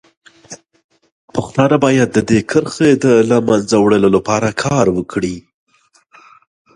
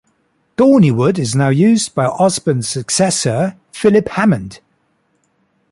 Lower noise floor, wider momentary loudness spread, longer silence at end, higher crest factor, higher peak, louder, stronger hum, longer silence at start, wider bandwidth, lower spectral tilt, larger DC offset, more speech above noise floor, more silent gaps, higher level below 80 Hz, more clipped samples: second, -51 dBFS vs -62 dBFS; first, 11 LU vs 8 LU; first, 1.35 s vs 1.15 s; about the same, 16 dB vs 14 dB; about the same, 0 dBFS vs -2 dBFS; about the same, -14 LUFS vs -14 LUFS; neither; about the same, 0.5 s vs 0.6 s; about the same, 11.5 kHz vs 11.5 kHz; about the same, -6 dB/octave vs -5.5 dB/octave; neither; second, 38 dB vs 48 dB; first, 0.84-0.89 s, 1.12-1.28 s vs none; about the same, -46 dBFS vs -50 dBFS; neither